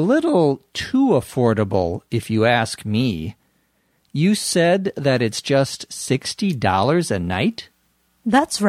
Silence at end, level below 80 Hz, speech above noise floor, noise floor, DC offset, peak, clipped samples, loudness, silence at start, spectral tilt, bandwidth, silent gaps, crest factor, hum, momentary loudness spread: 0 s; -50 dBFS; 46 dB; -64 dBFS; under 0.1%; -2 dBFS; under 0.1%; -20 LUFS; 0 s; -5.5 dB/octave; 15.5 kHz; none; 18 dB; none; 8 LU